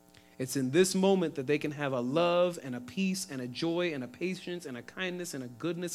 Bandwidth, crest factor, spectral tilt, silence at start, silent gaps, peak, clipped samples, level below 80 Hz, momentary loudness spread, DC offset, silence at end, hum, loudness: 15.5 kHz; 20 dB; -5 dB/octave; 0.4 s; none; -12 dBFS; under 0.1%; -74 dBFS; 12 LU; under 0.1%; 0 s; none; -32 LUFS